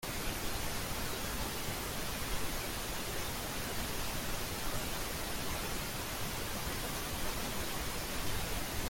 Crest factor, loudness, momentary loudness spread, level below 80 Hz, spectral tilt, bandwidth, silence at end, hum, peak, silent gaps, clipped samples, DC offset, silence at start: 14 dB; -38 LUFS; 1 LU; -44 dBFS; -3 dB/octave; 17 kHz; 0 s; none; -22 dBFS; none; under 0.1%; under 0.1%; 0 s